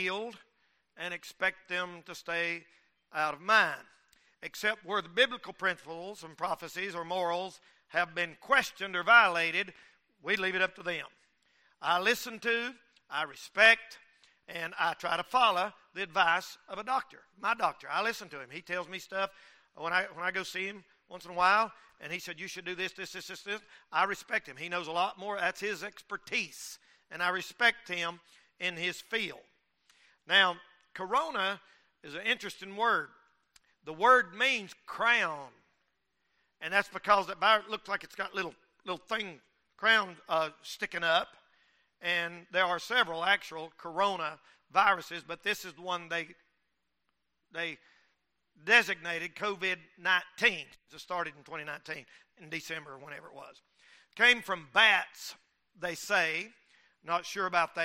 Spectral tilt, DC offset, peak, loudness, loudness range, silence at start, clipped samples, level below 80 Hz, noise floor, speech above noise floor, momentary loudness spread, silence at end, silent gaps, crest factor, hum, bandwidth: -2 dB/octave; under 0.1%; -8 dBFS; -30 LUFS; 6 LU; 0 s; under 0.1%; -74 dBFS; -83 dBFS; 51 dB; 18 LU; 0 s; none; 24 dB; none; 16 kHz